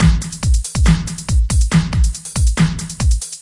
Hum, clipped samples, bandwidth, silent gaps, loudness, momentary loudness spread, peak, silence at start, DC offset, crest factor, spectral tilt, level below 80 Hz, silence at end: none; under 0.1%; 11.5 kHz; none; -17 LUFS; 4 LU; 0 dBFS; 0 s; under 0.1%; 14 dB; -5 dB/octave; -18 dBFS; 0 s